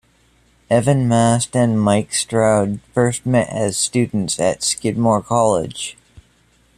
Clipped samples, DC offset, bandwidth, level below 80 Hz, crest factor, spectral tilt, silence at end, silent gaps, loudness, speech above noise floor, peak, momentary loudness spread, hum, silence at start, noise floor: under 0.1%; under 0.1%; 14 kHz; -50 dBFS; 16 dB; -5 dB/octave; 0.55 s; none; -17 LUFS; 39 dB; -2 dBFS; 5 LU; none; 0.7 s; -56 dBFS